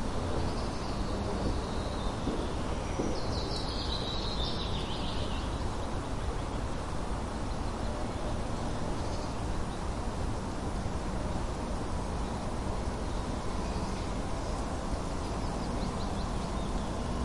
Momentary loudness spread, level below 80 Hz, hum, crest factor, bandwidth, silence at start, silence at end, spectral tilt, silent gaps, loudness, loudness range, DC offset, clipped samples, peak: 3 LU; -38 dBFS; none; 14 dB; 11.5 kHz; 0 s; 0 s; -5.5 dB/octave; none; -35 LUFS; 2 LU; under 0.1%; under 0.1%; -18 dBFS